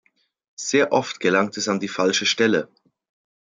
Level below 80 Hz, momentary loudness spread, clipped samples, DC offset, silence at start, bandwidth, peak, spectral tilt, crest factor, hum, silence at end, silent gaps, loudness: -70 dBFS; 6 LU; under 0.1%; under 0.1%; 0.6 s; 9.4 kHz; -4 dBFS; -3 dB/octave; 18 dB; none; 0.9 s; none; -21 LUFS